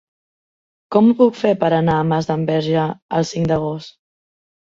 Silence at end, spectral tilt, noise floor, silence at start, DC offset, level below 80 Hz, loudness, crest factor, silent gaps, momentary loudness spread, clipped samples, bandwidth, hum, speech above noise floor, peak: 0.9 s; -7 dB/octave; under -90 dBFS; 0.9 s; under 0.1%; -52 dBFS; -17 LUFS; 16 dB; 3.02-3.09 s; 7 LU; under 0.1%; 7.6 kHz; none; over 73 dB; -2 dBFS